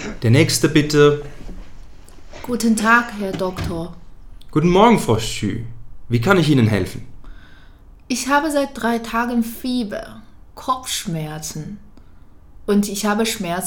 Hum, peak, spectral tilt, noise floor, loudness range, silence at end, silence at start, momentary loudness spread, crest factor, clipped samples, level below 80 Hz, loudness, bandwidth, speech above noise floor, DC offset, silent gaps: none; 0 dBFS; -5 dB/octave; -43 dBFS; 7 LU; 0 s; 0 s; 18 LU; 20 dB; under 0.1%; -40 dBFS; -18 LUFS; 18 kHz; 25 dB; under 0.1%; none